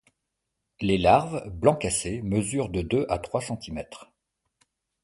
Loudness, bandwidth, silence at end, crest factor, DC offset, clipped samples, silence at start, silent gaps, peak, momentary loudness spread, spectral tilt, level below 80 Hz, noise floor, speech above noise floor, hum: -26 LUFS; 11.5 kHz; 1 s; 22 dB; under 0.1%; under 0.1%; 0.8 s; none; -4 dBFS; 15 LU; -5 dB/octave; -46 dBFS; -82 dBFS; 56 dB; none